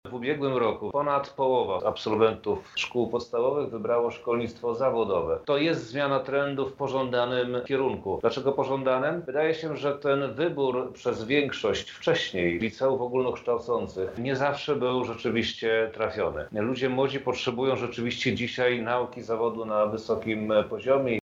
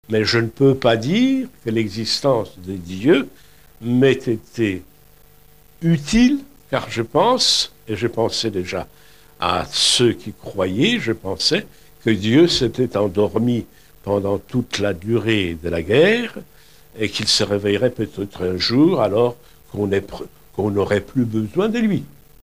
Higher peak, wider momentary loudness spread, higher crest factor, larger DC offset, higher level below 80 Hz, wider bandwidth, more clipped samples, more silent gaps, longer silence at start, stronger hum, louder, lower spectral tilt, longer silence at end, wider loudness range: second, -8 dBFS vs -2 dBFS; second, 4 LU vs 11 LU; about the same, 18 dB vs 18 dB; second, under 0.1% vs 0.6%; second, -58 dBFS vs -46 dBFS; second, 7.8 kHz vs 15.5 kHz; neither; neither; about the same, 0.05 s vs 0.1 s; neither; second, -27 LUFS vs -19 LUFS; about the same, -6 dB/octave vs -5 dB/octave; second, 0.05 s vs 0.35 s; about the same, 1 LU vs 2 LU